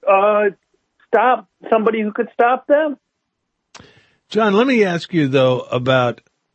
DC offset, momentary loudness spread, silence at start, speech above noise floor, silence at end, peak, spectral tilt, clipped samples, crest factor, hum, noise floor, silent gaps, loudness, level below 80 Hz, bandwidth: under 0.1%; 8 LU; 0 s; 58 dB; 0.4 s; -2 dBFS; -6.5 dB/octave; under 0.1%; 16 dB; none; -74 dBFS; none; -17 LUFS; -64 dBFS; 8.4 kHz